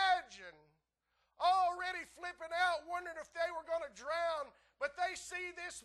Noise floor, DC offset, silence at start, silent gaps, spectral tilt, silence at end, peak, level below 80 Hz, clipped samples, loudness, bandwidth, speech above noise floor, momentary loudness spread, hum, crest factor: -82 dBFS; under 0.1%; 0 s; none; -1 dB/octave; 0.05 s; -20 dBFS; -72 dBFS; under 0.1%; -38 LUFS; 12.5 kHz; 42 dB; 13 LU; none; 18 dB